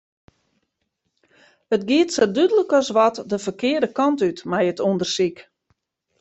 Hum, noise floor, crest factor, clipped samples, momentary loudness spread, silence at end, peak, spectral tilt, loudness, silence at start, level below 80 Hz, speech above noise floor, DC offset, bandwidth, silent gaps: none; -75 dBFS; 18 dB; under 0.1%; 7 LU; 0.8 s; -4 dBFS; -4.5 dB/octave; -20 LUFS; 1.7 s; -66 dBFS; 56 dB; under 0.1%; 8.2 kHz; none